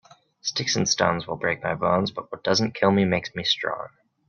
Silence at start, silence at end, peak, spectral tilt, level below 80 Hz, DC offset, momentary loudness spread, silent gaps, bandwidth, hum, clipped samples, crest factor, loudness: 0.45 s; 0.4 s; -6 dBFS; -4 dB/octave; -60 dBFS; under 0.1%; 9 LU; none; 7.2 kHz; none; under 0.1%; 20 dB; -24 LUFS